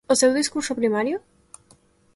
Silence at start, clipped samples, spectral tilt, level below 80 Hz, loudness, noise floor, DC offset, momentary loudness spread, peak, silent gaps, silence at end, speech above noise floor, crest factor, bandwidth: 0.1 s; under 0.1%; -2.5 dB/octave; -64 dBFS; -22 LUFS; -58 dBFS; under 0.1%; 9 LU; -6 dBFS; none; 0.95 s; 36 dB; 18 dB; 12 kHz